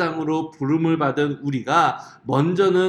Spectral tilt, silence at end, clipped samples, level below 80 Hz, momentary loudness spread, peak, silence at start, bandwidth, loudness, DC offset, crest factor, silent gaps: -7 dB/octave; 0 s; under 0.1%; -64 dBFS; 6 LU; -4 dBFS; 0 s; 10 kHz; -21 LUFS; under 0.1%; 16 dB; none